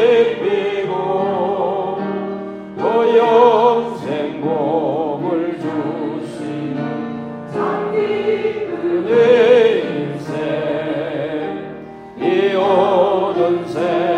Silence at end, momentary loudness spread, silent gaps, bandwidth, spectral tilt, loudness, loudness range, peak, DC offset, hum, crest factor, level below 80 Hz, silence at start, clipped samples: 0 s; 13 LU; none; 9 kHz; -7 dB/octave; -17 LUFS; 5 LU; 0 dBFS; under 0.1%; none; 16 dB; -58 dBFS; 0 s; under 0.1%